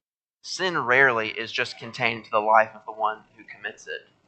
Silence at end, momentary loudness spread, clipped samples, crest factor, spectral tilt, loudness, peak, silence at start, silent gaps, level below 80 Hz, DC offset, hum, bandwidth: 0.3 s; 18 LU; under 0.1%; 22 dB; -3.5 dB/octave; -23 LUFS; -4 dBFS; 0.45 s; none; -72 dBFS; under 0.1%; none; 9 kHz